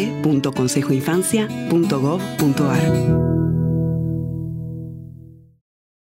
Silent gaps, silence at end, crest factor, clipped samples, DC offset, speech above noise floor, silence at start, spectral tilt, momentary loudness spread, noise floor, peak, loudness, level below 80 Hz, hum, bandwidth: none; 0.7 s; 14 dB; under 0.1%; under 0.1%; 24 dB; 0 s; -6.5 dB/octave; 12 LU; -42 dBFS; -6 dBFS; -19 LUFS; -42 dBFS; none; 16 kHz